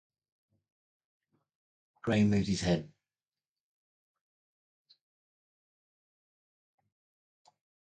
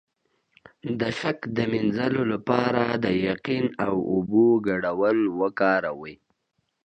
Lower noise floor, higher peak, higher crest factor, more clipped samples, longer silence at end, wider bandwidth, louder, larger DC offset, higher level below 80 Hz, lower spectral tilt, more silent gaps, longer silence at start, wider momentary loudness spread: first, under -90 dBFS vs -75 dBFS; second, -16 dBFS vs -4 dBFS; about the same, 22 dB vs 20 dB; neither; first, 5 s vs 0.7 s; about the same, 9.2 kHz vs 8.6 kHz; second, -31 LUFS vs -24 LUFS; neither; about the same, -60 dBFS vs -58 dBFS; second, -6 dB/octave vs -7.5 dB/octave; neither; first, 2.05 s vs 0.85 s; about the same, 7 LU vs 8 LU